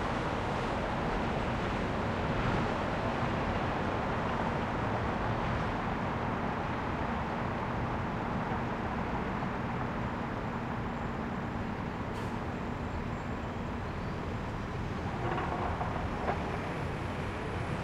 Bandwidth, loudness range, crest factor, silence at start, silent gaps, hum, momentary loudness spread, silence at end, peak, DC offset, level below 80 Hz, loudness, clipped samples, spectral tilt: 13 kHz; 4 LU; 16 dB; 0 s; none; none; 4 LU; 0 s; -18 dBFS; under 0.1%; -44 dBFS; -34 LUFS; under 0.1%; -7 dB/octave